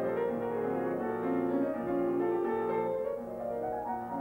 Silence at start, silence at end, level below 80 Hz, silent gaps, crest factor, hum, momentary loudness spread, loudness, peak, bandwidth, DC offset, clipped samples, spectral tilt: 0 s; 0 s; -64 dBFS; none; 12 dB; none; 6 LU; -33 LUFS; -20 dBFS; 16 kHz; under 0.1%; under 0.1%; -8.5 dB/octave